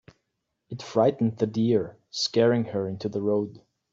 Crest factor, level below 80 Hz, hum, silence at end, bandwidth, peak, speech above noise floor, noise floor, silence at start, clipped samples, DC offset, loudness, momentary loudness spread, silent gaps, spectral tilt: 18 dB; -66 dBFS; none; 0.35 s; 7.8 kHz; -8 dBFS; 55 dB; -79 dBFS; 0.7 s; under 0.1%; under 0.1%; -25 LUFS; 12 LU; none; -6 dB/octave